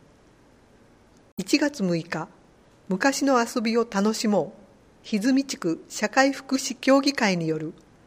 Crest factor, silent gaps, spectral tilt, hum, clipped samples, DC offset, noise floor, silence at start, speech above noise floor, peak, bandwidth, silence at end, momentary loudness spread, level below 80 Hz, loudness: 22 dB; none; -4.5 dB/octave; none; under 0.1%; under 0.1%; -56 dBFS; 1.4 s; 32 dB; -4 dBFS; 15.5 kHz; 0.35 s; 12 LU; -64 dBFS; -24 LUFS